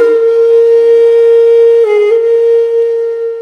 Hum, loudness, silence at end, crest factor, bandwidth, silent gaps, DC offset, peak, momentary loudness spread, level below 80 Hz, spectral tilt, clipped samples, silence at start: none; -8 LUFS; 0 s; 6 dB; 5.8 kHz; none; under 0.1%; 0 dBFS; 5 LU; -74 dBFS; -2.5 dB/octave; under 0.1%; 0 s